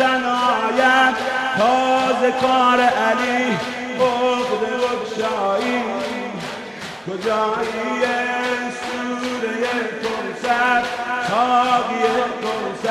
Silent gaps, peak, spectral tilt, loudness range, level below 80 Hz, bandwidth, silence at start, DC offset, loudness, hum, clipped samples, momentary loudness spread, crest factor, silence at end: none; -4 dBFS; -3.5 dB/octave; 6 LU; -58 dBFS; 13.5 kHz; 0 s; under 0.1%; -19 LUFS; none; under 0.1%; 9 LU; 16 dB; 0 s